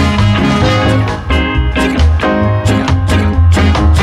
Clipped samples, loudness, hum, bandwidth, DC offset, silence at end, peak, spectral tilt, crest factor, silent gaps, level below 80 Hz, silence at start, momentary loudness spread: under 0.1%; -11 LUFS; none; 12 kHz; under 0.1%; 0 s; -2 dBFS; -6.5 dB/octave; 8 dB; none; -16 dBFS; 0 s; 4 LU